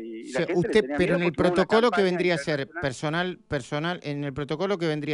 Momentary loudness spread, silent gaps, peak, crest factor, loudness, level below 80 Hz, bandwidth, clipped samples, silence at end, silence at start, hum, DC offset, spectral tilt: 10 LU; none; -8 dBFS; 16 dB; -25 LUFS; -54 dBFS; 11 kHz; under 0.1%; 0 s; 0 s; none; under 0.1%; -6 dB/octave